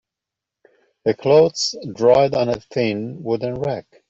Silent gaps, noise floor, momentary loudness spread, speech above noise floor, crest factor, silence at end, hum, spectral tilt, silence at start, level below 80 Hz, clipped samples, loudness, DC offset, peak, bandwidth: none; -85 dBFS; 10 LU; 67 dB; 18 dB; 0.3 s; none; -5 dB/octave; 1.05 s; -56 dBFS; under 0.1%; -19 LUFS; under 0.1%; -2 dBFS; 8 kHz